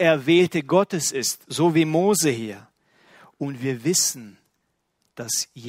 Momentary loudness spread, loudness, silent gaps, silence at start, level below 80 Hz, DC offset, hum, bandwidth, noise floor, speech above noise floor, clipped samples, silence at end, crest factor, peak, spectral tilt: 14 LU; -21 LUFS; none; 0 s; -66 dBFS; under 0.1%; none; 16 kHz; -73 dBFS; 52 dB; under 0.1%; 0 s; 18 dB; -4 dBFS; -4 dB/octave